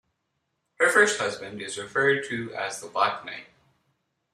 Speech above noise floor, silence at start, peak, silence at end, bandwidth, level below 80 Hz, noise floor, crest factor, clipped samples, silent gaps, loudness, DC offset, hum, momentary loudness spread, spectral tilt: 52 dB; 0.8 s; -6 dBFS; 0.9 s; 15 kHz; -72 dBFS; -78 dBFS; 22 dB; under 0.1%; none; -25 LUFS; under 0.1%; none; 16 LU; -2.5 dB/octave